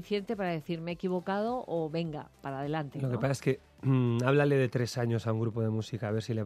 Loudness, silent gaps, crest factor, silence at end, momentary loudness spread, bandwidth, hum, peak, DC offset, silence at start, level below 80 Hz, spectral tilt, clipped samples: -32 LUFS; none; 18 dB; 0 s; 9 LU; 14 kHz; none; -12 dBFS; under 0.1%; 0 s; -64 dBFS; -7 dB/octave; under 0.1%